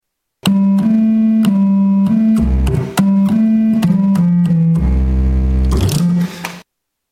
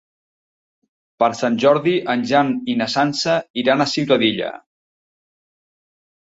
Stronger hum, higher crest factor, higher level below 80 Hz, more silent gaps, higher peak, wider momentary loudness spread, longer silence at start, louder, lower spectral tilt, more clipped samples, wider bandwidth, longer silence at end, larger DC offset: neither; second, 12 dB vs 18 dB; first, -20 dBFS vs -62 dBFS; second, none vs 3.50-3.54 s; about the same, 0 dBFS vs -2 dBFS; about the same, 4 LU vs 5 LU; second, 0.45 s vs 1.2 s; first, -13 LUFS vs -18 LUFS; first, -7.5 dB/octave vs -5 dB/octave; neither; first, 16 kHz vs 8 kHz; second, 0.5 s vs 1.6 s; neither